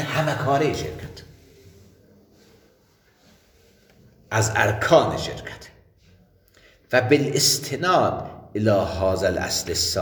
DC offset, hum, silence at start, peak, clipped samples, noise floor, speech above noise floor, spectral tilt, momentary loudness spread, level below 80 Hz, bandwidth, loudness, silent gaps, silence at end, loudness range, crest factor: under 0.1%; none; 0 s; -2 dBFS; under 0.1%; -60 dBFS; 38 dB; -4 dB/octave; 15 LU; -48 dBFS; 19.5 kHz; -21 LUFS; none; 0 s; 9 LU; 22 dB